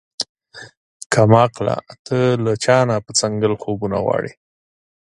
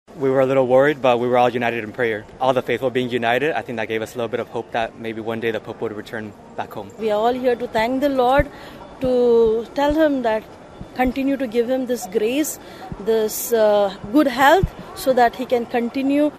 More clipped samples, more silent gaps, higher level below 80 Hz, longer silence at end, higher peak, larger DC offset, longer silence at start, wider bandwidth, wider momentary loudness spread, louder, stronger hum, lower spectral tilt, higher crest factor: neither; first, 0.29-0.35 s, 0.77-1.00 s, 1.06-1.10 s, 1.99-2.05 s vs none; second, -50 dBFS vs -42 dBFS; first, 0.8 s vs 0 s; about the same, 0 dBFS vs 0 dBFS; neither; about the same, 0.2 s vs 0.1 s; second, 11.5 kHz vs 14.5 kHz; about the same, 14 LU vs 13 LU; about the same, -18 LUFS vs -20 LUFS; neither; about the same, -5 dB/octave vs -5 dB/octave; about the same, 18 dB vs 18 dB